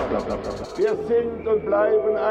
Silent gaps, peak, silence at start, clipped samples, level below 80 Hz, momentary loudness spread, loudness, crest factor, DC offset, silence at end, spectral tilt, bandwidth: none; -10 dBFS; 0 s; under 0.1%; -46 dBFS; 9 LU; -23 LUFS; 12 dB; under 0.1%; 0 s; -6.5 dB/octave; 8.8 kHz